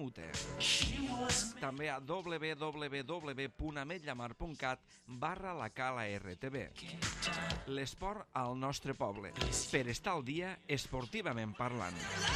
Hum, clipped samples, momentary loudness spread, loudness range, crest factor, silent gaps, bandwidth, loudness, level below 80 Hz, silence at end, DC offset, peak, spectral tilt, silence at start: none; under 0.1%; 8 LU; 5 LU; 22 dB; none; 14.5 kHz; -39 LUFS; -54 dBFS; 0 s; under 0.1%; -18 dBFS; -3.5 dB/octave; 0 s